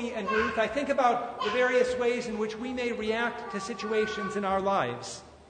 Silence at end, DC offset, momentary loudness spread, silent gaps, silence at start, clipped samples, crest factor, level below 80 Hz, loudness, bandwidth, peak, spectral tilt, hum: 0.05 s; under 0.1%; 8 LU; none; 0 s; under 0.1%; 18 dB; -58 dBFS; -29 LUFS; 9.6 kHz; -12 dBFS; -4.5 dB/octave; none